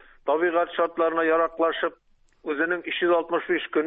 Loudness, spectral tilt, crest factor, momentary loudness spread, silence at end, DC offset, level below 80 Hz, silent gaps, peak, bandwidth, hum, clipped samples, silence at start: -24 LUFS; -7.5 dB/octave; 14 dB; 7 LU; 0 s; under 0.1%; -64 dBFS; none; -10 dBFS; 4 kHz; none; under 0.1%; 0.25 s